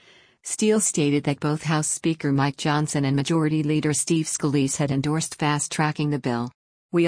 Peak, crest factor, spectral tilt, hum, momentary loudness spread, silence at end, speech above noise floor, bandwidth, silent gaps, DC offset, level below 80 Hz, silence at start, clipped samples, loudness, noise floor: -10 dBFS; 14 dB; -5 dB/octave; none; 5 LU; 0 s; 20 dB; 10.5 kHz; 6.54-6.89 s; under 0.1%; -60 dBFS; 0.45 s; under 0.1%; -23 LUFS; -42 dBFS